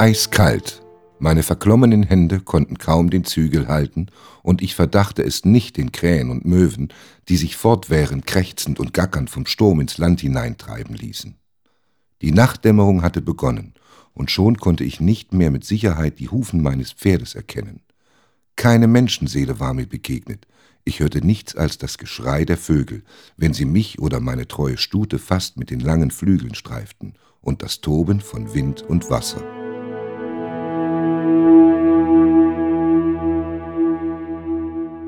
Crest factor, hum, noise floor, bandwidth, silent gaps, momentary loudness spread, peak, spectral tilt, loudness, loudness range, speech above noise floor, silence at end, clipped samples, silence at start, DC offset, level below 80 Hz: 18 dB; none; -69 dBFS; 19 kHz; none; 15 LU; 0 dBFS; -6.5 dB/octave; -18 LUFS; 6 LU; 52 dB; 0 s; under 0.1%; 0 s; under 0.1%; -34 dBFS